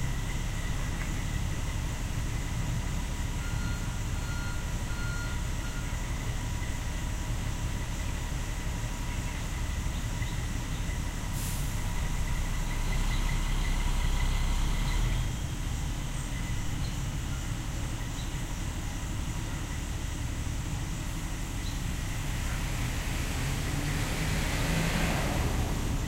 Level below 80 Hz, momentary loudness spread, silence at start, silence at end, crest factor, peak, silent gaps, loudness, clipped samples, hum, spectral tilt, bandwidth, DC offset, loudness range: -32 dBFS; 5 LU; 0 s; 0 s; 14 dB; -16 dBFS; none; -34 LUFS; under 0.1%; none; -4.5 dB/octave; 16 kHz; 0.2%; 3 LU